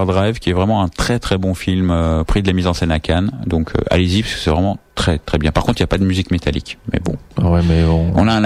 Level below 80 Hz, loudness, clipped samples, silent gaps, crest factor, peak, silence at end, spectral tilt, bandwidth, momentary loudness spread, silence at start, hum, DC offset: -26 dBFS; -17 LUFS; under 0.1%; none; 12 dB; -4 dBFS; 0 s; -6.5 dB/octave; 13 kHz; 6 LU; 0 s; none; under 0.1%